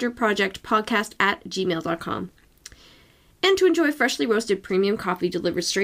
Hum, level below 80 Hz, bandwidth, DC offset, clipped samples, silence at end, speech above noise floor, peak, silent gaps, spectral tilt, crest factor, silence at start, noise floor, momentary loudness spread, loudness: none; -58 dBFS; 16 kHz; under 0.1%; under 0.1%; 0 s; 32 dB; -4 dBFS; none; -4 dB/octave; 20 dB; 0 s; -55 dBFS; 8 LU; -23 LUFS